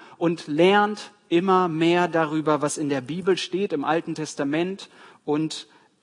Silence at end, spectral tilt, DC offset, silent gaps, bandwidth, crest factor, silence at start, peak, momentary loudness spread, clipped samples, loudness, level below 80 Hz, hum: 0.4 s; -5 dB/octave; under 0.1%; none; 11 kHz; 18 dB; 0 s; -6 dBFS; 11 LU; under 0.1%; -23 LUFS; -74 dBFS; none